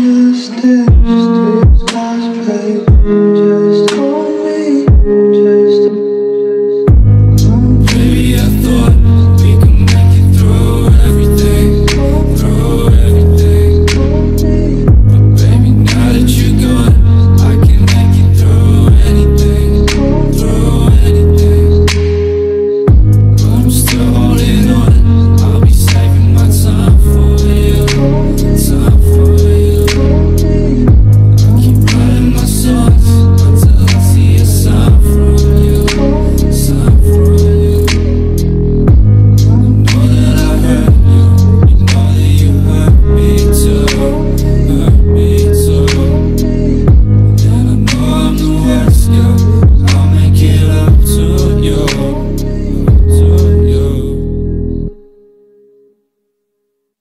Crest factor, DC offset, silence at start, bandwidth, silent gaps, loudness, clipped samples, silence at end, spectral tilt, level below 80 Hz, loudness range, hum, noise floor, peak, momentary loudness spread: 6 dB; under 0.1%; 0 s; 15.5 kHz; none; -8 LUFS; under 0.1%; 2.05 s; -7 dB/octave; -12 dBFS; 2 LU; none; -66 dBFS; 0 dBFS; 5 LU